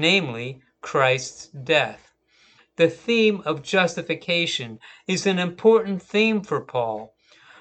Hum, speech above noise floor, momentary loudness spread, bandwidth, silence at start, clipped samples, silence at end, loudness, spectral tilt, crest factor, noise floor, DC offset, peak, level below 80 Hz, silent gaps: none; 37 dB; 15 LU; 9 kHz; 0 s; under 0.1%; 0.55 s; -22 LUFS; -4.5 dB/octave; 20 dB; -59 dBFS; under 0.1%; -4 dBFS; -68 dBFS; none